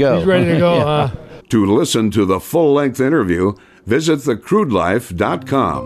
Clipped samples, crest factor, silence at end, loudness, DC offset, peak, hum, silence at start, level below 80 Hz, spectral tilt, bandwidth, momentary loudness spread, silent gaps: under 0.1%; 12 dB; 0 s; -15 LUFS; under 0.1%; -4 dBFS; none; 0 s; -44 dBFS; -6 dB/octave; 14 kHz; 6 LU; none